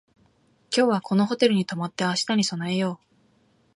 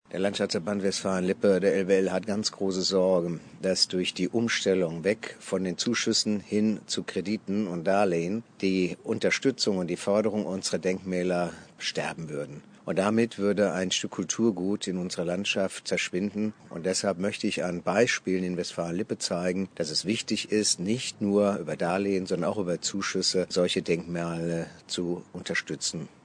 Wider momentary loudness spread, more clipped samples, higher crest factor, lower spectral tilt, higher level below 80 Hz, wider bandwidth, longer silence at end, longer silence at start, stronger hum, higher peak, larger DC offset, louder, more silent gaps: about the same, 7 LU vs 7 LU; neither; about the same, 18 dB vs 18 dB; about the same, -5 dB/octave vs -4 dB/octave; about the same, -70 dBFS vs -68 dBFS; first, 11.5 kHz vs 10 kHz; first, 0.8 s vs 0.2 s; first, 0.7 s vs 0.15 s; neither; first, -6 dBFS vs -10 dBFS; neither; first, -24 LUFS vs -28 LUFS; neither